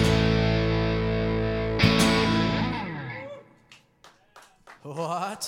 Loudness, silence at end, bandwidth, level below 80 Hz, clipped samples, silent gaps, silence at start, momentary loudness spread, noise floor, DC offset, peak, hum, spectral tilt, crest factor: -24 LUFS; 0 s; 16.5 kHz; -38 dBFS; under 0.1%; none; 0 s; 16 LU; -57 dBFS; under 0.1%; -6 dBFS; none; -5.5 dB/octave; 20 dB